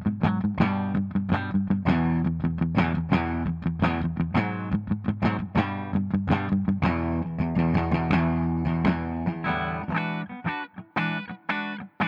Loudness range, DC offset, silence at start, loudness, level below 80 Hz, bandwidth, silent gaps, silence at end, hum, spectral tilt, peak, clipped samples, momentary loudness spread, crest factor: 2 LU; under 0.1%; 0 s; -26 LUFS; -44 dBFS; 5.6 kHz; none; 0 s; none; -9 dB/octave; -8 dBFS; under 0.1%; 6 LU; 18 dB